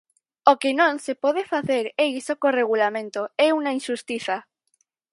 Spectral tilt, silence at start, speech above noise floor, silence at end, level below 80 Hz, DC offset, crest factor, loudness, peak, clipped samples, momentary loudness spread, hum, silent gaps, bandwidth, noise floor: -4 dB/octave; 0.45 s; 48 dB; 0.7 s; -74 dBFS; under 0.1%; 22 dB; -23 LUFS; 0 dBFS; under 0.1%; 9 LU; none; none; 11.5 kHz; -70 dBFS